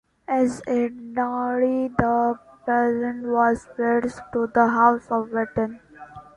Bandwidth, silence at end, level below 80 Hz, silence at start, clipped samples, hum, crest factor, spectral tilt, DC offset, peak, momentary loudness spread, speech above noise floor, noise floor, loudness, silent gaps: 11 kHz; 0.15 s; -52 dBFS; 0.3 s; under 0.1%; none; 20 dB; -7.5 dB/octave; under 0.1%; -2 dBFS; 8 LU; 21 dB; -43 dBFS; -23 LUFS; none